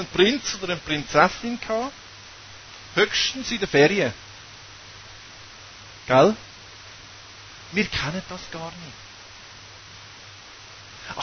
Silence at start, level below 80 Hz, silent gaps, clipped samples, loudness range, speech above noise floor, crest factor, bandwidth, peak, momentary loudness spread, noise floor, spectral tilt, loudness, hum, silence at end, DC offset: 0 s; -52 dBFS; none; under 0.1%; 8 LU; 21 dB; 24 dB; 6.6 kHz; -2 dBFS; 23 LU; -44 dBFS; -4 dB/octave; -22 LUFS; none; 0 s; under 0.1%